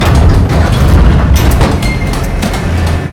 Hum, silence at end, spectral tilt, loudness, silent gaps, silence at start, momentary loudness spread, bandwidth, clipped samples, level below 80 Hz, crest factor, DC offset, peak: none; 0 s; -6 dB/octave; -10 LUFS; none; 0 s; 6 LU; 18 kHz; 1%; -10 dBFS; 8 dB; under 0.1%; 0 dBFS